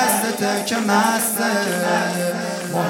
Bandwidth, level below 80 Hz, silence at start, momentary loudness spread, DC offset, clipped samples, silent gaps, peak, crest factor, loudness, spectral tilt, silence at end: 17.5 kHz; -68 dBFS; 0 s; 6 LU; under 0.1%; under 0.1%; none; -2 dBFS; 18 dB; -19 LUFS; -3.5 dB/octave; 0 s